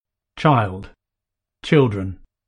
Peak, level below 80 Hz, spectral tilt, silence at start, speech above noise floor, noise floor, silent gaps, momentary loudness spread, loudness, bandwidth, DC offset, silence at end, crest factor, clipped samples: -2 dBFS; -48 dBFS; -8 dB/octave; 0.35 s; 66 dB; -84 dBFS; none; 17 LU; -19 LUFS; 10 kHz; under 0.1%; 0.3 s; 18 dB; under 0.1%